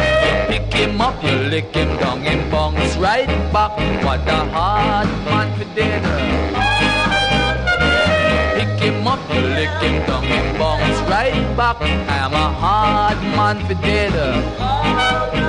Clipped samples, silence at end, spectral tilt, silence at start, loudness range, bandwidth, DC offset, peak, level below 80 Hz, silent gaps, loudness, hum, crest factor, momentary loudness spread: under 0.1%; 0 s; -5.5 dB/octave; 0 s; 2 LU; 10.5 kHz; under 0.1%; -4 dBFS; -26 dBFS; none; -17 LUFS; none; 14 dB; 4 LU